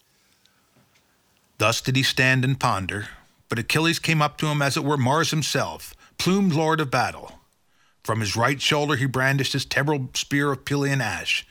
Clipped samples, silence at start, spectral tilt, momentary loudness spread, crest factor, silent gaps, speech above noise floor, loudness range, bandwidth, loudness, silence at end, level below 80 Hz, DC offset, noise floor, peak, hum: under 0.1%; 1.6 s; -4.5 dB/octave; 8 LU; 20 dB; none; 42 dB; 2 LU; 18 kHz; -22 LUFS; 0.1 s; -56 dBFS; under 0.1%; -65 dBFS; -4 dBFS; none